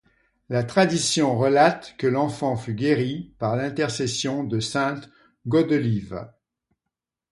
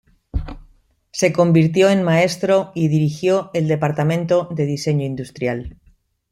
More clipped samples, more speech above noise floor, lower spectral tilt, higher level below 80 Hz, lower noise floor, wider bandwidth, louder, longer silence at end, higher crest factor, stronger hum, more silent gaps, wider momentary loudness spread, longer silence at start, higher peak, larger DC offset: neither; first, 62 dB vs 37 dB; second, -5 dB/octave vs -6.5 dB/octave; second, -58 dBFS vs -40 dBFS; first, -85 dBFS vs -54 dBFS; about the same, 11.5 kHz vs 12.5 kHz; second, -23 LUFS vs -18 LUFS; first, 1.05 s vs 0.6 s; about the same, 20 dB vs 16 dB; neither; neither; second, 9 LU vs 15 LU; first, 0.5 s vs 0.35 s; about the same, -4 dBFS vs -2 dBFS; neither